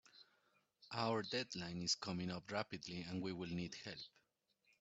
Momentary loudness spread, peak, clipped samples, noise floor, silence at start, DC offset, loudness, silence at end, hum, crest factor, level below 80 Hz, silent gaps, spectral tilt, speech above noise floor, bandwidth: 11 LU; -24 dBFS; under 0.1%; -82 dBFS; 0.15 s; under 0.1%; -44 LUFS; 0.7 s; none; 22 dB; -76 dBFS; none; -3.5 dB/octave; 38 dB; 8 kHz